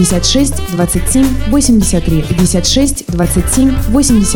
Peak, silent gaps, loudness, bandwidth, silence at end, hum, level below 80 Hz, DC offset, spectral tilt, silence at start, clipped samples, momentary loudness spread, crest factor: 0 dBFS; none; -11 LUFS; 19.5 kHz; 0 s; none; -20 dBFS; 8%; -4.5 dB/octave; 0 s; under 0.1%; 4 LU; 10 dB